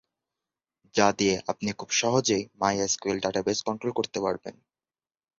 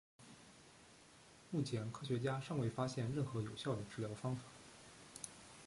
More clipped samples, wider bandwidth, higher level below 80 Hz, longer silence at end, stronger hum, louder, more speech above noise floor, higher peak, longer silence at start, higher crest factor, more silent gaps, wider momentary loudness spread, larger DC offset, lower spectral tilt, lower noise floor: neither; second, 7.8 kHz vs 11.5 kHz; first, -62 dBFS vs -70 dBFS; first, 0.85 s vs 0 s; neither; first, -27 LUFS vs -43 LUFS; first, over 63 dB vs 22 dB; first, -6 dBFS vs -26 dBFS; first, 0.95 s vs 0.2 s; about the same, 22 dB vs 18 dB; neither; second, 8 LU vs 21 LU; neither; second, -3.5 dB/octave vs -6 dB/octave; first, under -90 dBFS vs -64 dBFS